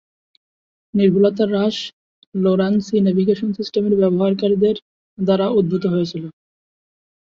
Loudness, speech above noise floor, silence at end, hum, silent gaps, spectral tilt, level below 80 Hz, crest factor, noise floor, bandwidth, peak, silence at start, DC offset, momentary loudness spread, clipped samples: -18 LUFS; over 73 dB; 0.95 s; none; 1.93-2.32 s, 4.82-5.17 s; -8 dB/octave; -58 dBFS; 16 dB; under -90 dBFS; 7.2 kHz; -4 dBFS; 0.95 s; under 0.1%; 11 LU; under 0.1%